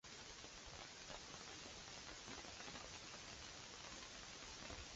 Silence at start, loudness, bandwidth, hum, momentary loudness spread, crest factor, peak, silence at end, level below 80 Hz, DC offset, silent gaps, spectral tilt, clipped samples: 0.05 s; -53 LUFS; 8 kHz; none; 2 LU; 20 dB; -36 dBFS; 0 s; -68 dBFS; under 0.1%; none; -1.5 dB/octave; under 0.1%